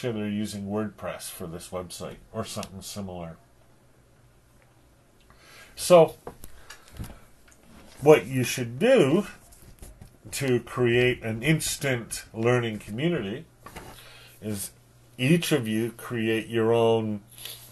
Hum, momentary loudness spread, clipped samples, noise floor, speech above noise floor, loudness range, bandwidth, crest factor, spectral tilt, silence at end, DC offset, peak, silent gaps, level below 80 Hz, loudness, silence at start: none; 23 LU; under 0.1%; -58 dBFS; 33 dB; 14 LU; 13 kHz; 24 dB; -5 dB/octave; 0 s; under 0.1%; -2 dBFS; none; -54 dBFS; -25 LUFS; 0 s